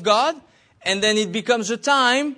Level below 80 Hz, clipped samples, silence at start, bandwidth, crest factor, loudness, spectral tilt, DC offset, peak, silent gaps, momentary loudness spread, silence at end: -64 dBFS; under 0.1%; 0 s; 11 kHz; 16 dB; -19 LUFS; -2.5 dB/octave; under 0.1%; -4 dBFS; none; 8 LU; 0.05 s